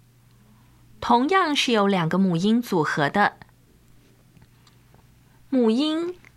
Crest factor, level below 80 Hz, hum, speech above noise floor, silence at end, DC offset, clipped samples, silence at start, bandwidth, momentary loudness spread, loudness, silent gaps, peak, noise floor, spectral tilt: 18 dB; -60 dBFS; none; 34 dB; 0.25 s; under 0.1%; under 0.1%; 1 s; 14.5 kHz; 5 LU; -22 LUFS; none; -6 dBFS; -55 dBFS; -5.5 dB/octave